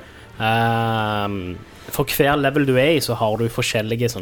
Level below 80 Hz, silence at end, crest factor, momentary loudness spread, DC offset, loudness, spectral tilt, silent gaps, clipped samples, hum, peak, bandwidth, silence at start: -44 dBFS; 0 s; 16 dB; 10 LU; under 0.1%; -20 LUFS; -5 dB/octave; none; under 0.1%; none; -4 dBFS; 19.5 kHz; 0 s